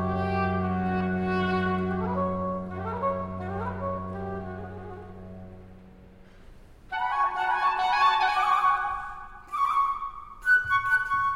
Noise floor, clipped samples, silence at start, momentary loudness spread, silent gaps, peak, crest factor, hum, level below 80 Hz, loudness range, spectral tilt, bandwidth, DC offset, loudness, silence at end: -50 dBFS; under 0.1%; 0 s; 17 LU; none; -12 dBFS; 16 dB; none; -52 dBFS; 12 LU; -6.5 dB/octave; 13.5 kHz; under 0.1%; -26 LUFS; 0 s